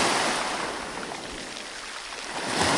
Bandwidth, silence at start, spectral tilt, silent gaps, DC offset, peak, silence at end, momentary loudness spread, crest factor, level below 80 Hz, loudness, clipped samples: 11.5 kHz; 0 s; -2 dB/octave; none; under 0.1%; -10 dBFS; 0 s; 11 LU; 20 dB; -56 dBFS; -29 LUFS; under 0.1%